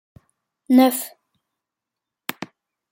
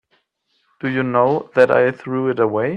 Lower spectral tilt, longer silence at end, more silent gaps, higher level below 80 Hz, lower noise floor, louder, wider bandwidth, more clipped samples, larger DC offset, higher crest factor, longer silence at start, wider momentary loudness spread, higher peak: second, -3.5 dB/octave vs -8 dB/octave; first, 0.45 s vs 0 s; neither; second, -72 dBFS vs -64 dBFS; first, -85 dBFS vs -67 dBFS; about the same, -18 LUFS vs -18 LUFS; first, 16.5 kHz vs 8.2 kHz; neither; neither; about the same, 20 dB vs 18 dB; second, 0.7 s vs 0.85 s; first, 22 LU vs 8 LU; second, -4 dBFS vs 0 dBFS